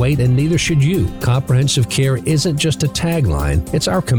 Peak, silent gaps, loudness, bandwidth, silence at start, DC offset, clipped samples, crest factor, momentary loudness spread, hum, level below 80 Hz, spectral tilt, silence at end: -8 dBFS; none; -16 LUFS; over 20 kHz; 0 s; under 0.1%; under 0.1%; 8 dB; 3 LU; none; -30 dBFS; -5.5 dB/octave; 0 s